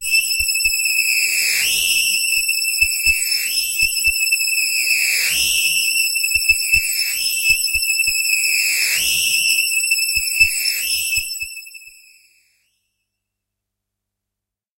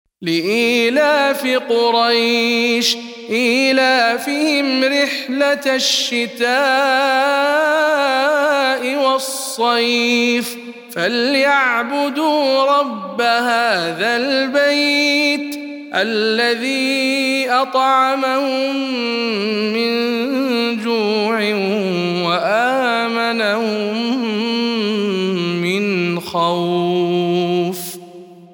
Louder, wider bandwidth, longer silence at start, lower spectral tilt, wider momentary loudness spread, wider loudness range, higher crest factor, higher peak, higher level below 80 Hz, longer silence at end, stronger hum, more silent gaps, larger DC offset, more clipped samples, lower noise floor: about the same, -15 LUFS vs -16 LUFS; second, 16 kHz vs 18 kHz; second, 0 s vs 0.2 s; second, 3 dB/octave vs -3.5 dB/octave; second, 3 LU vs 6 LU; about the same, 5 LU vs 3 LU; about the same, 18 dB vs 14 dB; about the same, -2 dBFS vs -2 dBFS; first, -44 dBFS vs -72 dBFS; first, 2.9 s vs 0.1 s; first, 50 Hz at -65 dBFS vs none; neither; neither; neither; first, -85 dBFS vs -38 dBFS